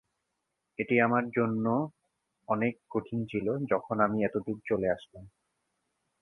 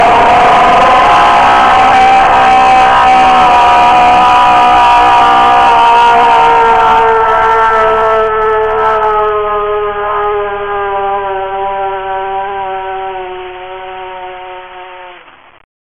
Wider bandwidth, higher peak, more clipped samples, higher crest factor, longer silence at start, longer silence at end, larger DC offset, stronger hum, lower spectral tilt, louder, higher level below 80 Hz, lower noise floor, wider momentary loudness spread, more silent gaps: second, 3.8 kHz vs 11 kHz; second, -10 dBFS vs 0 dBFS; neither; first, 22 dB vs 8 dB; first, 0.8 s vs 0 s; first, 0.95 s vs 0.7 s; neither; neither; first, -9.5 dB/octave vs -3.5 dB/octave; second, -30 LUFS vs -7 LUFS; second, -64 dBFS vs -32 dBFS; first, -83 dBFS vs -37 dBFS; second, 10 LU vs 18 LU; neither